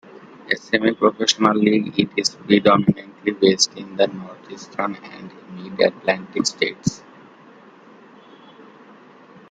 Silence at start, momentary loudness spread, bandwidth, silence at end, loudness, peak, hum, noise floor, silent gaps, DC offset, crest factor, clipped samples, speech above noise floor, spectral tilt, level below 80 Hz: 0.45 s; 20 LU; 9.4 kHz; 2.55 s; -19 LUFS; 0 dBFS; none; -47 dBFS; none; under 0.1%; 22 dB; under 0.1%; 27 dB; -4 dB/octave; -60 dBFS